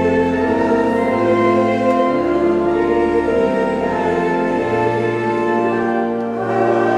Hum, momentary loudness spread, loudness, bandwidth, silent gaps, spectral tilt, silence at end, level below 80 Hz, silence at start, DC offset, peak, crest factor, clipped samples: none; 3 LU; -16 LUFS; 10 kHz; none; -7.5 dB/octave; 0 s; -44 dBFS; 0 s; under 0.1%; -4 dBFS; 12 dB; under 0.1%